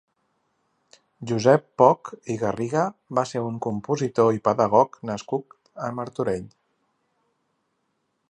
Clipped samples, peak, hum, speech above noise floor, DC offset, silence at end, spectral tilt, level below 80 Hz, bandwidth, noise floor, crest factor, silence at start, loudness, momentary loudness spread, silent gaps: under 0.1%; -2 dBFS; none; 51 dB; under 0.1%; 1.85 s; -6.5 dB/octave; -62 dBFS; 10.5 kHz; -74 dBFS; 22 dB; 1.2 s; -23 LUFS; 13 LU; none